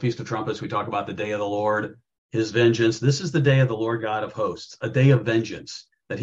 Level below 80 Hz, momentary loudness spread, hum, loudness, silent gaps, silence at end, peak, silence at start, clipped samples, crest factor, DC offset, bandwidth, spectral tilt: -62 dBFS; 13 LU; none; -23 LUFS; 2.18-2.29 s; 0 s; -6 dBFS; 0 s; under 0.1%; 18 dB; under 0.1%; 7.8 kHz; -6.5 dB/octave